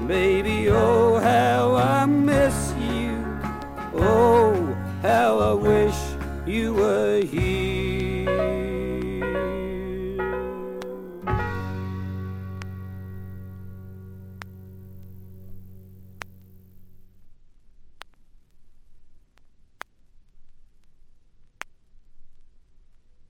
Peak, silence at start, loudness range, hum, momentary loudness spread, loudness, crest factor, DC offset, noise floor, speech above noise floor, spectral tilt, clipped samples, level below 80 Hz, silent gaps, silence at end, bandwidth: -6 dBFS; 0 s; 22 LU; none; 24 LU; -23 LUFS; 18 dB; under 0.1%; -53 dBFS; 34 dB; -6.5 dB/octave; under 0.1%; -40 dBFS; none; 0.1 s; 16.5 kHz